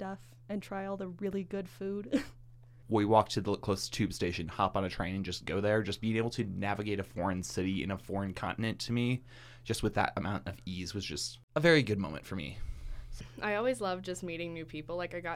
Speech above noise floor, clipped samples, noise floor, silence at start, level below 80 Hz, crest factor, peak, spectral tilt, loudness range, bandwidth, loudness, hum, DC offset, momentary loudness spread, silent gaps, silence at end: 21 dB; under 0.1%; -54 dBFS; 0 s; -52 dBFS; 24 dB; -10 dBFS; -5.5 dB/octave; 3 LU; 16 kHz; -34 LUFS; none; under 0.1%; 13 LU; 11.43-11.48 s; 0 s